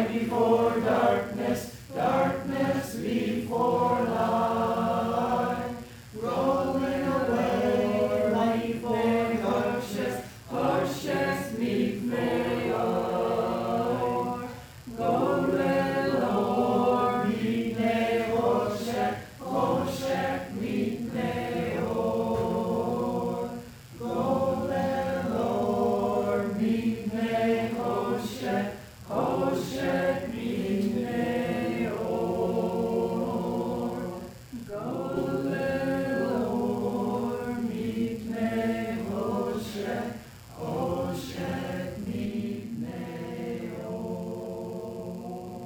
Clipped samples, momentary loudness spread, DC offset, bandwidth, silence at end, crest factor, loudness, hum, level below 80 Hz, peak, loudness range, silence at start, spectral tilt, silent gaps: under 0.1%; 10 LU; under 0.1%; 17.5 kHz; 0 s; 18 dB; -28 LUFS; none; -56 dBFS; -10 dBFS; 5 LU; 0 s; -6.5 dB/octave; none